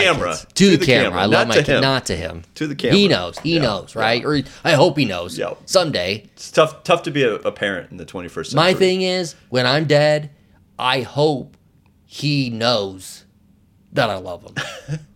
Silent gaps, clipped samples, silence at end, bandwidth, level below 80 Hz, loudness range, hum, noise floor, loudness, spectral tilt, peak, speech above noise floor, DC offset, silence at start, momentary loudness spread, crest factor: none; under 0.1%; 0.1 s; 16.5 kHz; -48 dBFS; 6 LU; none; -55 dBFS; -18 LUFS; -4.5 dB/octave; 0 dBFS; 36 dB; under 0.1%; 0 s; 14 LU; 18 dB